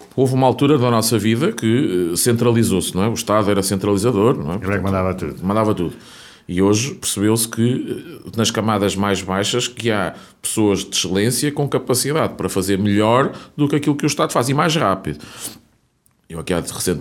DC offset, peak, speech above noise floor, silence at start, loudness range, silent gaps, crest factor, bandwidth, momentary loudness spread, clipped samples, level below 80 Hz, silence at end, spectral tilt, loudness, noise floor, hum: under 0.1%; -2 dBFS; 43 dB; 0 s; 3 LU; none; 16 dB; 17.5 kHz; 8 LU; under 0.1%; -48 dBFS; 0 s; -5 dB/octave; -18 LUFS; -60 dBFS; none